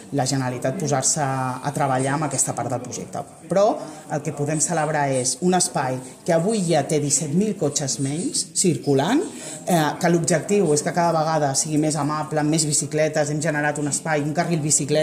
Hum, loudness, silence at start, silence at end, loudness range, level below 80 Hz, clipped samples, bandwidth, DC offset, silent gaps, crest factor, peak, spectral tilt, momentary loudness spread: none; -21 LUFS; 0 s; 0 s; 3 LU; -60 dBFS; under 0.1%; 16 kHz; under 0.1%; none; 16 dB; -6 dBFS; -4 dB/octave; 7 LU